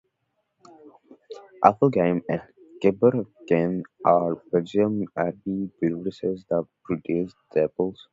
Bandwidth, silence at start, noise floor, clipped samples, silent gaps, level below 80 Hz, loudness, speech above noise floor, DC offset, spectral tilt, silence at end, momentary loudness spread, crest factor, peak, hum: 7.6 kHz; 0.85 s; -76 dBFS; under 0.1%; none; -60 dBFS; -24 LUFS; 52 dB; under 0.1%; -9 dB/octave; 0.2 s; 10 LU; 24 dB; 0 dBFS; none